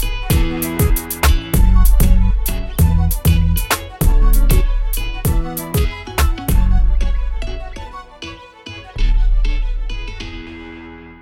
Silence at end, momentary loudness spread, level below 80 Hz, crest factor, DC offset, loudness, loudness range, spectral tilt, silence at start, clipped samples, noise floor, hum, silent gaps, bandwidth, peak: 0.1 s; 17 LU; -16 dBFS; 14 dB; under 0.1%; -18 LUFS; 9 LU; -5 dB/octave; 0 s; under 0.1%; -35 dBFS; none; none; 17 kHz; 0 dBFS